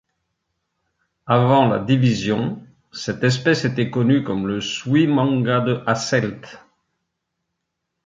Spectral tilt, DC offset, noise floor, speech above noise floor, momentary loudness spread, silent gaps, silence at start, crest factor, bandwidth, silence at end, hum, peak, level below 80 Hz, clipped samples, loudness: -6 dB/octave; under 0.1%; -78 dBFS; 59 dB; 12 LU; none; 1.25 s; 18 dB; 7.6 kHz; 1.5 s; none; -2 dBFS; -56 dBFS; under 0.1%; -19 LUFS